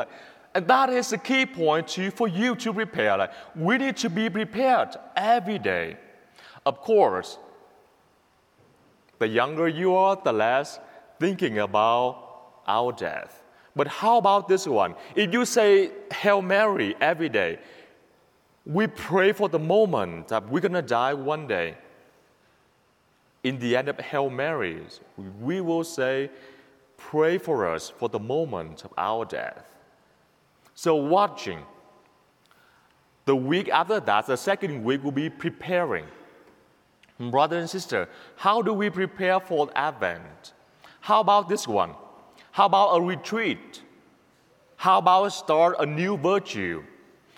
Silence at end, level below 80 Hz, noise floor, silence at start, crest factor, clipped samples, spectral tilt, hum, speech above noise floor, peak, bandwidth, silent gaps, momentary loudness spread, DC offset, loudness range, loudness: 0.5 s; -68 dBFS; -64 dBFS; 0 s; 20 dB; under 0.1%; -5 dB/octave; none; 40 dB; -6 dBFS; 17 kHz; none; 12 LU; under 0.1%; 6 LU; -24 LUFS